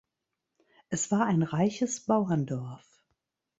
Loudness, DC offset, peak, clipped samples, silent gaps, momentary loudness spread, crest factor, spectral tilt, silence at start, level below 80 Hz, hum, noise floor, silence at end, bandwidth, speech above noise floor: -29 LUFS; under 0.1%; -12 dBFS; under 0.1%; none; 11 LU; 18 dB; -6 dB/octave; 0.9 s; -68 dBFS; none; -85 dBFS; 0.85 s; 8.2 kHz; 58 dB